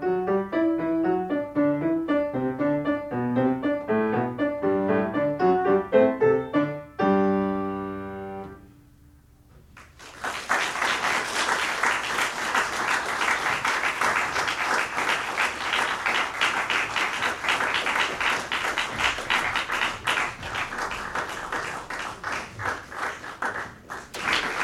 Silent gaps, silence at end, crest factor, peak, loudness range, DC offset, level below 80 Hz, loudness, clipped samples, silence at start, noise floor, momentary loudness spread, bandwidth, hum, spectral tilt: none; 0 s; 20 dB; -6 dBFS; 7 LU; under 0.1%; -54 dBFS; -25 LUFS; under 0.1%; 0 s; -54 dBFS; 9 LU; 16 kHz; none; -4 dB/octave